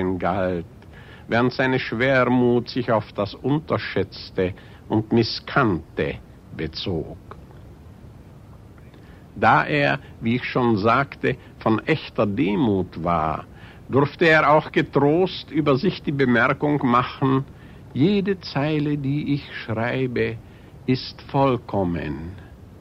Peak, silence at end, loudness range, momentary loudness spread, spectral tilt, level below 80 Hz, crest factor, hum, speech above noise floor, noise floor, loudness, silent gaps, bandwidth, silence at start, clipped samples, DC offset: -4 dBFS; 0 s; 5 LU; 13 LU; -8 dB/octave; -48 dBFS; 18 dB; none; 23 dB; -44 dBFS; -22 LUFS; none; 8.4 kHz; 0 s; under 0.1%; under 0.1%